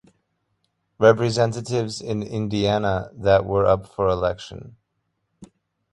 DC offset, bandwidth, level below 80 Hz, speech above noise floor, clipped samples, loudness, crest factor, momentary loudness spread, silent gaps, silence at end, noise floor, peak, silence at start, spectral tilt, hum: under 0.1%; 11.5 kHz; -46 dBFS; 54 dB; under 0.1%; -21 LUFS; 22 dB; 10 LU; none; 0.5 s; -74 dBFS; -2 dBFS; 1 s; -6 dB/octave; none